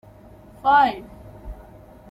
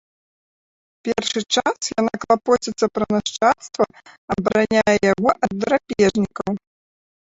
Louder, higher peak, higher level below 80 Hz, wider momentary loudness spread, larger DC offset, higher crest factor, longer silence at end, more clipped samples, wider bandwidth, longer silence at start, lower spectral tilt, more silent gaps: about the same, -19 LUFS vs -20 LUFS; second, -6 dBFS vs -2 dBFS; first, -46 dBFS vs -52 dBFS; first, 26 LU vs 7 LU; neither; about the same, 18 dB vs 18 dB; about the same, 0.55 s vs 0.65 s; neither; first, 12.5 kHz vs 8 kHz; second, 0.65 s vs 1.05 s; first, -5.5 dB/octave vs -4 dB/octave; second, none vs 4.18-4.28 s